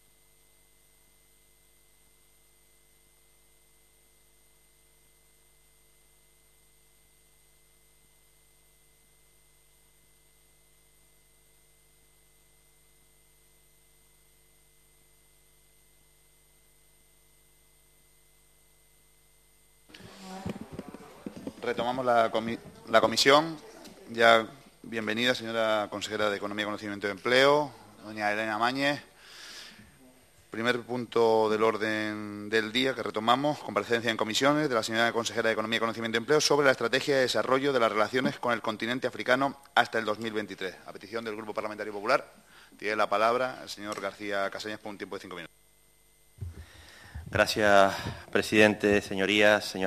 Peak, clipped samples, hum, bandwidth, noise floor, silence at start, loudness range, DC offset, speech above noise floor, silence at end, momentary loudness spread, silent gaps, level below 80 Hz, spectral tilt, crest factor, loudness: -6 dBFS; under 0.1%; 50 Hz at -65 dBFS; 14.5 kHz; -64 dBFS; 19.95 s; 9 LU; under 0.1%; 36 dB; 0 s; 22 LU; none; -62 dBFS; -3.5 dB/octave; 26 dB; -27 LUFS